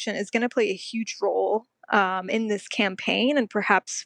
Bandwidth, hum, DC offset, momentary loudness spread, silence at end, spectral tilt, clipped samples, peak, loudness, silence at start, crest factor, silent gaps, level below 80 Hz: 10.5 kHz; none; under 0.1%; 5 LU; 0 s; -3.5 dB/octave; under 0.1%; -4 dBFS; -25 LUFS; 0 s; 20 dB; none; -82 dBFS